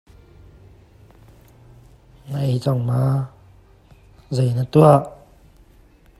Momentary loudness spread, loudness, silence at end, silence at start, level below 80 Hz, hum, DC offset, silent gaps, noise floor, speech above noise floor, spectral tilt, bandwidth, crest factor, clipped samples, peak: 17 LU; -19 LUFS; 1.05 s; 2.25 s; -50 dBFS; none; under 0.1%; none; -51 dBFS; 34 dB; -8.5 dB/octave; 12.5 kHz; 22 dB; under 0.1%; 0 dBFS